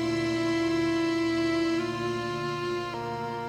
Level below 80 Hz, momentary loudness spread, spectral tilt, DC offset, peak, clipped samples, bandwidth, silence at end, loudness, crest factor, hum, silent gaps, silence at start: -56 dBFS; 6 LU; -5.5 dB/octave; under 0.1%; -18 dBFS; under 0.1%; 11 kHz; 0 s; -28 LUFS; 10 dB; none; none; 0 s